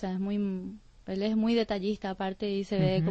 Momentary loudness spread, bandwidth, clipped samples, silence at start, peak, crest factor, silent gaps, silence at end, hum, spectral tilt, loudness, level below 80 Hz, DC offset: 11 LU; 8 kHz; under 0.1%; 0 s; -14 dBFS; 16 dB; none; 0 s; none; -8 dB/octave; -30 LUFS; -54 dBFS; under 0.1%